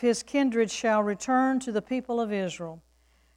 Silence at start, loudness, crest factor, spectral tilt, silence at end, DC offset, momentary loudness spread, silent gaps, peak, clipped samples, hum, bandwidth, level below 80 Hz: 0 s; -27 LUFS; 14 dB; -4.5 dB/octave; 0.6 s; under 0.1%; 8 LU; none; -12 dBFS; under 0.1%; none; 11.5 kHz; -64 dBFS